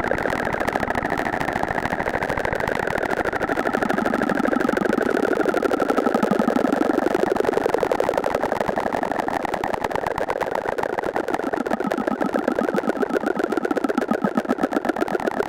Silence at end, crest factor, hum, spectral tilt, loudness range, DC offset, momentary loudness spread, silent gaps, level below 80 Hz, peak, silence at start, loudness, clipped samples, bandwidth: 0 s; 20 dB; none; -6 dB/octave; 3 LU; under 0.1%; 4 LU; none; -46 dBFS; -2 dBFS; 0 s; -22 LUFS; under 0.1%; 16.5 kHz